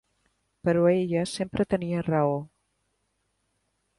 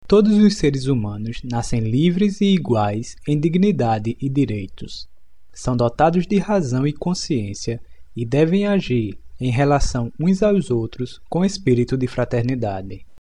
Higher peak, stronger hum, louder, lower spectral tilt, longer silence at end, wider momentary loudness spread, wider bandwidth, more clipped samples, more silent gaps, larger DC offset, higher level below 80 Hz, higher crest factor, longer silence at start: second, -10 dBFS vs -4 dBFS; neither; second, -26 LUFS vs -20 LUFS; about the same, -7 dB/octave vs -7 dB/octave; first, 1.5 s vs 0.2 s; second, 8 LU vs 12 LU; about the same, 11.5 kHz vs 10.5 kHz; neither; neither; second, under 0.1% vs 1%; second, -58 dBFS vs -36 dBFS; about the same, 18 dB vs 16 dB; first, 0.65 s vs 0.1 s